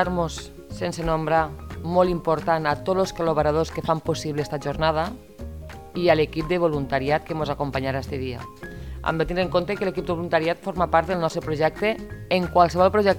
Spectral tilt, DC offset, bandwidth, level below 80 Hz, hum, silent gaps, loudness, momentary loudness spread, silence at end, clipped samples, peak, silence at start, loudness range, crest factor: -6 dB/octave; 0.2%; 19 kHz; -42 dBFS; none; none; -24 LUFS; 13 LU; 0 s; under 0.1%; -2 dBFS; 0 s; 3 LU; 20 dB